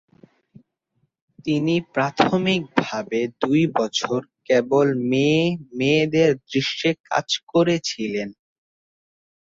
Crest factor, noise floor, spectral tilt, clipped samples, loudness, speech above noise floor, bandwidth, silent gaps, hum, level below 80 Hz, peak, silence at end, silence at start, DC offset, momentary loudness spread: 20 dB; -71 dBFS; -5.5 dB/octave; under 0.1%; -21 LUFS; 50 dB; 7.8 kHz; 7.00-7.04 s, 7.43-7.47 s; none; -62 dBFS; -2 dBFS; 1.25 s; 1.45 s; under 0.1%; 7 LU